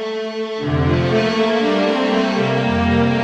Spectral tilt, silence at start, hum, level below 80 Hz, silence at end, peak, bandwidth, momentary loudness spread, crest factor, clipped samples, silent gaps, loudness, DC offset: -6.5 dB/octave; 0 s; none; -38 dBFS; 0 s; -4 dBFS; 8.8 kHz; 7 LU; 14 dB; under 0.1%; none; -17 LUFS; under 0.1%